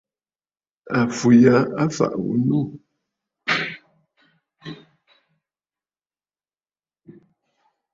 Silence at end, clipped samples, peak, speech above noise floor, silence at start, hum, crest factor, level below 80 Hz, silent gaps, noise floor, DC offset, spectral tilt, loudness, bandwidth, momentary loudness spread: 3.2 s; under 0.1%; -2 dBFS; over 72 dB; 0.85 s; none; 22 dB; -62 dBFS; none; under -90 dBFS; under 0.1%; -6.5 dB/octave; -20 LUFS; 7.8 kHz; 25 LU